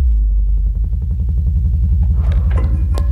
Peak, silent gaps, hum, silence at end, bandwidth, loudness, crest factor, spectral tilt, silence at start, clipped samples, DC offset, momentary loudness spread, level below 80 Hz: -6 dBFS; none; none; 0 s; 4 kHz; -17 LUFS; 8 dB; -9 dB/octave; 0 s; under 0.1%; under 0.1%; 4 LU; -14 dBFS